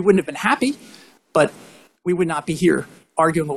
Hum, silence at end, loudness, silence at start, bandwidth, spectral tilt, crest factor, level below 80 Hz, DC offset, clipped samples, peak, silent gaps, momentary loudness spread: none; 0 s; -20 LUFS; 0 s; 13 kHz; -5.5 dB/octave; 18 dB; -56 dBFS; under 0.1%; under 0.1%; -2 dBFS; none; 7 LU